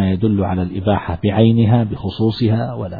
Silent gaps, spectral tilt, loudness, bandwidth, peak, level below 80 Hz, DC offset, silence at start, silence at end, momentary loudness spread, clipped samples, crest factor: none; -11 dB/octave; -17 LUFS; 4.9 kHz; 0 dBFS; -40 dBFS; 0.4%; 0 s; 0 s; 7 LU; under 0.1%; 16 dB